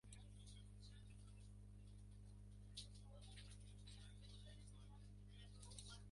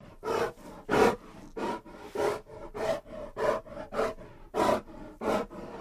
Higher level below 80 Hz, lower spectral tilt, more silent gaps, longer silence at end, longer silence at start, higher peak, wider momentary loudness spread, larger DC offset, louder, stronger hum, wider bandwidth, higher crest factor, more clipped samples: second, -64 dBFS vs -52 dBFS; about the same, -4 dB/octave vs -5 dB/octave; neither; about the same, 0 s vs 0 s; about the same, 0.05 s vs 0 s; second, -40 dBFS vs -8 dBFS; second, 5 LU vs 15 LU; neither; second, -61 LUFS vs -32 LUFS; first, 50 Hz at -60 dBFS vs none; second, 11.5 kHz vs 15.5 kHz; about the same, 20 dB vs 22 dB; neither